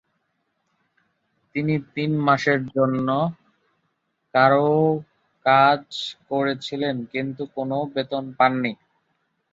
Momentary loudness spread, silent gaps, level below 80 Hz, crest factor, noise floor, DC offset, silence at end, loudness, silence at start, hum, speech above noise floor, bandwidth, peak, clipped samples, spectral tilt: 12 LU; none; -66 dBFS; 20 dB; -73 dBFS; under 0.1%; 0.8 s; -22 LUFS; 1.55 s; none; 52 dB; 7.8 kHz; -4 dBFS; under 0.1%; -7 dB/octave